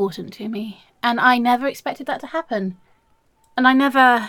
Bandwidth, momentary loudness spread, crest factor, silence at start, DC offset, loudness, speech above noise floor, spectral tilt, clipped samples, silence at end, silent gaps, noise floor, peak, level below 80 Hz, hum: 17.5 kHz; 16 LU; 18 dB; 0 s; under 0.1%; -19 LUFS; 42 dB; -5 dB/octave; under 0.1%; 0 s; none; -61 dBFS; -2 dBFS; -66 dBFS; none